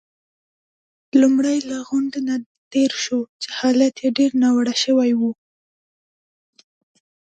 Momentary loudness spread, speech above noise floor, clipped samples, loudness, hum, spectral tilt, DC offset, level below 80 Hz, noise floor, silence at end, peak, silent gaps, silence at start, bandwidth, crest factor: 9 LU; over 72 dB; under 0.1%; -19 LUFS; none; -3.5 dB/octave; under 0.1%; -70 dBFS; under -90 dBFS; 1.95 s; -4 dBFS; 2.46-2.71 s, 3.29-3.40 s; 1.15 s; 9 kHz; 18 dB